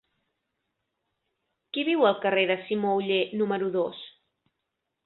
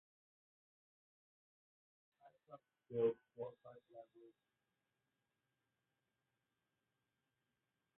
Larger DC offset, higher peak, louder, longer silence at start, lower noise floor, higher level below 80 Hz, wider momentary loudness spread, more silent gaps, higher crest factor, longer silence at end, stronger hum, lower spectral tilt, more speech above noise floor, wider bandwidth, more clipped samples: neither; first, -8 dBFS vs -28 dBFS; first, -26 LUFS vs -44 LUFS; second, 1.75 s vs 2.25 s; second, -82 dBFS vs -90 dBFS; first, -74 dBFS vs under -90 dBFS; second, 11 LU vs 23 LU; neither; second, 20 dB vs 26 dB; second, 0.95 s vs 3.7 s; neither; first, -9 dB/octave vs -6 dB/octave; first, 57 dB vs 45 dB; first, 4.3 kHz vs 3.8 kHz; neither